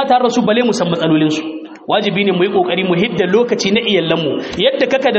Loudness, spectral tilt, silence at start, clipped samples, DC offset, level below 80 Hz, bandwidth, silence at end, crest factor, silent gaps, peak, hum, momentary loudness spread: -14 LUFS; -3.5 dB/octave; 0 s; under 0.1%; under 0.1%; -52 dBFS; 8 kHz; 0 s; 14 dB; none; 0 dBFS; none; 4 LU